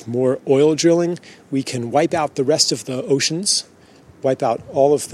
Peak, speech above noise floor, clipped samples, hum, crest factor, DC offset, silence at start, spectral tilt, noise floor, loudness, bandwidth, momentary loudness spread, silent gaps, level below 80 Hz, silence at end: 0 dBFS; 29 dB; under 0.1%; none; 18 dB; under 0.1%; 0 s; -4 dB/octave; -47 dBFS; -18 LUFS; 14.5 kHz; 9 LU; none; -62 dBFS; 0 s